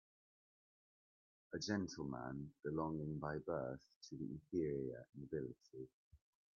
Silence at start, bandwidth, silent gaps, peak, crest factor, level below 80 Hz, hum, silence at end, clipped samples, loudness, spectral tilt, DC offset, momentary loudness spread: 1.5 s; 7.2 kHz; 3.96-4.01 s, 5.93-6.11 s; -26 dBFS; 20 dB; -72 dBFS; none; 0.4 s; under 0.1%; -46 LUFS; -6 dB/octave; under 0.1%; 13 LU